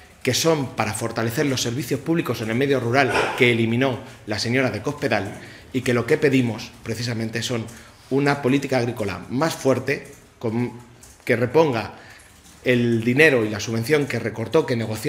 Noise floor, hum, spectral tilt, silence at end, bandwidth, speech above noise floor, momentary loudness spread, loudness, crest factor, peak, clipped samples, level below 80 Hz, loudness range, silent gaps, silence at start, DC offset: -47 dBFS; none; -5 dB/octave; 0 s; 16 kHz; 26 dB; 10 LU; -22 LUFS; 22 dB; 0 dBFS; under 0.1%; -54 dBFS; 3 LU; none; 0.25 s; under 0.1%